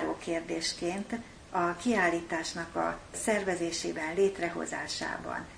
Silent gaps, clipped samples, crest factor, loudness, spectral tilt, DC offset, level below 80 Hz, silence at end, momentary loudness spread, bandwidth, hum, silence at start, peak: none; under 0.1%; 18 dB; -32 LUFS; -3.5 dB/octave; under 0.1%; -58 dBFS; 0 s; 7 LU; 10.5 kHz; none; 0 s; -14 dBFS